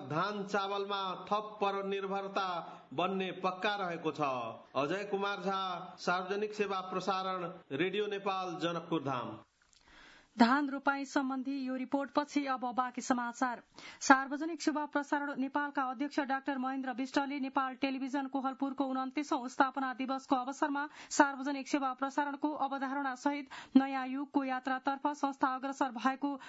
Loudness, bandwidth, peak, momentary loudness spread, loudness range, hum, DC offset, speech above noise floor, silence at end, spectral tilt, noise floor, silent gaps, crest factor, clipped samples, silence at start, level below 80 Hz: -35 LUFS; 7.6 kHz; -8 dBFS; 7 LU; 3 LU; none; under 0.1%; 29 dB; 0 s; -3 dB/octave; -64 dBFS; none; 26 dB; under 0.1%; 0 s; -80 dBFS